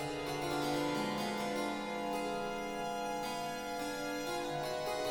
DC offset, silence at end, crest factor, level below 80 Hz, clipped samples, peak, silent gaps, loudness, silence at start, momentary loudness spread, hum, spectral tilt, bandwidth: under 0.1%; 0 s; 14 dB; -62 dBFS; under 0.1%; -24 dBFS; none; -37 LUFS; 0 s; 4 LU; none; -4 dB/octave; 19 kHz